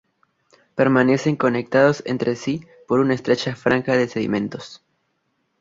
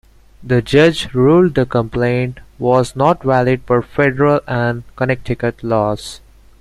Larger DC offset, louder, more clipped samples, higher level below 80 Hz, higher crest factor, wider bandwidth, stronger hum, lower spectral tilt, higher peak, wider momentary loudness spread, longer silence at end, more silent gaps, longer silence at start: neither; second, -20 LUFS vs -15 LUFS; neither; second, -58 dBFS vs -40 dBFS; about the same, 18 dB vs 14 dB; second, 7.8 kHz vs 12.5 kHz; neither; about the same, -6.5 dB/octave vs -7 dB/octave; about the same, -2 dBFS vs 0 dBFS; first, 12 LU vs 9 LU; first, 0.85 s vs 0.45 s; neither; first, 0.75 s vs 0.4 s